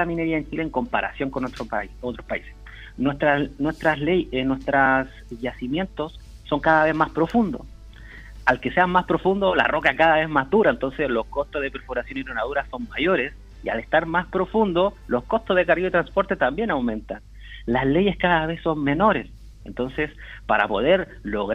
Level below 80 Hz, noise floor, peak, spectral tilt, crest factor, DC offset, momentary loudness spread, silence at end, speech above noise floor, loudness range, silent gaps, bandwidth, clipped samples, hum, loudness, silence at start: -42 dBFS; -41 dBFS; -4 dBFS; -7 dB/octave; 20 dB; under 0.1%; 13 LU; 0 s; 19 dB; 5 LU; none; 10.5 kHz; under 0.1%; none; -22 LUFS; 0 s